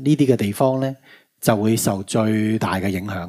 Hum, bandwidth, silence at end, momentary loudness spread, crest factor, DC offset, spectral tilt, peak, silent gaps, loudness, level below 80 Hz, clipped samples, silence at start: none; 16 kHz; 0 s; 7 LU; 20 dB; under 0.1%; -6 dB/octave; 0 dBFS; none; -20 LUFS; -60 dBFS; under 0.1%; 0 s